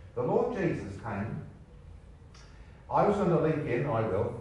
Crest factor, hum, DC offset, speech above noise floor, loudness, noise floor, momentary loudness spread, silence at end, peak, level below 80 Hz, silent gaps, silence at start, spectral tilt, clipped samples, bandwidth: 18 dB; none; under 0.1%; 22 dB; -30 LUFS; -51 dBFS; 11 LU; 0 s; -14 dBFS; -54 dBFS; none; 0 s; -8.5 dB/octave; under 0.1%; 10.5 kHz